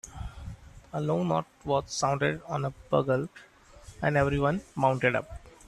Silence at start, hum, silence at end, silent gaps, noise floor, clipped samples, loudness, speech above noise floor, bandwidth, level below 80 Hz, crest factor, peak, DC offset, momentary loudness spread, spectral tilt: 0.05 s; none; 0.2 s; none; -51 dBFS; under 0.1%; -29 LUFS; 23 dB; 12.5 kHz; -48 dBFS; 20 dB; -10 dBFS; under 0.1%; 17 LU; -6 dB/octave